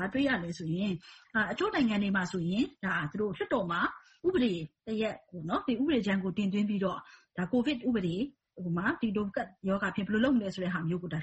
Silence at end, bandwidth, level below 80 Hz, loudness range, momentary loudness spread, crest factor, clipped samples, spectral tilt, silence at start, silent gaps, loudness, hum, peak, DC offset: 0 s; 8.2 kHz; -60 dBFS; 1 LU; 7 LU; 16 dB; under 0.1%; -6.5 dB/octave; 0 s; none; -32 LUFS; none; -16 dBFS; under 0.1%